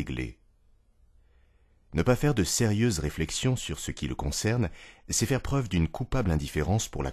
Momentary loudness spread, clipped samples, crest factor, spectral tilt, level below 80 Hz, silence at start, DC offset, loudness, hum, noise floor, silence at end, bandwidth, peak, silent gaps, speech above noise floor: 9 LU; under 0.1%; 18 dB; -5 dB/octave; -40 dBFS; 0 s; under 0.1%; -28 LUFS; none; -62 dBFS; 0 s; 14 kHz; -10 dBFS; none; 34 dB